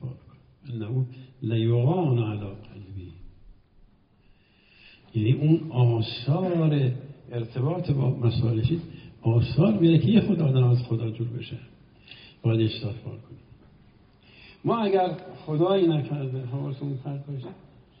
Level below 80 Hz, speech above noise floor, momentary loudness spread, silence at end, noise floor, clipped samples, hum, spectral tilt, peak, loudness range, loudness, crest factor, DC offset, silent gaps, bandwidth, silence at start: -54 dBFS; 35 dB; 18 LU; 0.45 s; -59 dBFS; under 0.1%; none; -8 dB/octave; -8 dBFS; 8 LU; -25 LUFS; 18 dB; under 0.1%; none; 5.2 kHz; 0 s